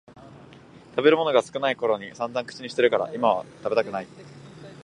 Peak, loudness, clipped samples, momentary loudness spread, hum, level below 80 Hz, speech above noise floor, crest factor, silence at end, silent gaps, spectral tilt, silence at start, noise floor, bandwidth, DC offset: -4 dBFS; -24 LUFS; under 0.1%; 22 LU; none; -68 dBFS; 24 dB; 22 dB; 0.05 s; none; -5 dB/octave; 0.15 s; -48 dBFS; 10.5 kHz; under 0.1%